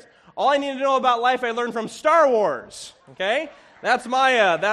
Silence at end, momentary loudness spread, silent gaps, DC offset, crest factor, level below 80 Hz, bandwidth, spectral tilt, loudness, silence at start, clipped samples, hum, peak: 0 s; 18 LU; none; under 0.1%; 16 dB; -68 dBFS; 12.5 kHz; -3 dB/octave; -20 LUFS; 0.35 s; under 0.1%; none; -4 dBFS